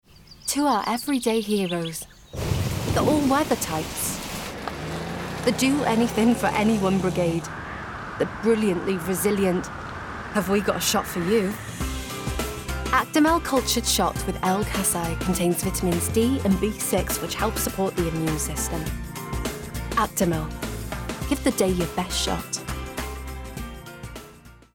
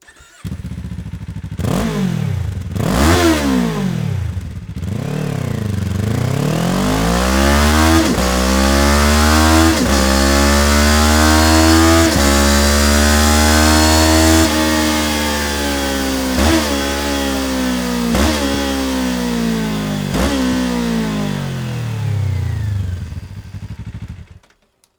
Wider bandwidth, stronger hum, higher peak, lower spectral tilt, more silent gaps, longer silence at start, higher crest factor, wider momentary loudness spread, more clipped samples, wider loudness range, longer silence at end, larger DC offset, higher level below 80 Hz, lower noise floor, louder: about the same, 19 kHz vs over 20 kHz; neither; second, -8 dBFS vs 0 dBFS; about the same, -4.5 dB/octave vs -4.5 dB/octave; neither; second, 0.2 s vs 0.45 s; about the same, 16 dB vs 14 dB; second, 12 LU vs 16 LU; neither; second, 4 LU vs 9 LU; second, 0.2 s vs 0.75 s; neither; second, -38 dBFS vs -24 dBFS; second, -47 dBFS vs -57 dBFS; second, -24 LUFS vs -14 LUFS